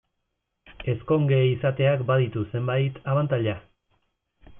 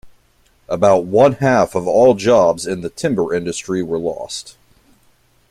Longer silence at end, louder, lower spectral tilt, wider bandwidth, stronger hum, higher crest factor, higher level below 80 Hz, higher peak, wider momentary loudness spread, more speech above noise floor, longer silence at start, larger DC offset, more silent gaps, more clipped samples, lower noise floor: second, 0 s vs 1 s; second, -24 LUFS vs -16 LUFS; first, -11.5 dB/octave vs -5.5 dB/octave; second, 3.7 kHz vs 13.5 kHz; neither; about the same, 14 dB vs 16 dB; about the same, -56 dBFS vs -52 dBFS; second, -10 dBFS vs 0 dBFS; second, 9 LU vs 12 LU; first, 55 dB vs 41 dB; first, 0.7 s vs 0.05 s; neither; neither; neither; first, -79 dBFS vs -56 dBFS